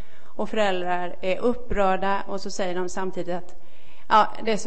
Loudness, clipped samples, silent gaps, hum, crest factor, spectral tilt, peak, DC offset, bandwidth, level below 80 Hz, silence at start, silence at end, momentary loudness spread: -25 LUFS; under 0.1%; none; none; 20 dB; -4.5 dB/octave; -4 dBFS; 7%; 8.8 kHz; -42 dBFS; 0.35 s; 0 s; 12 LU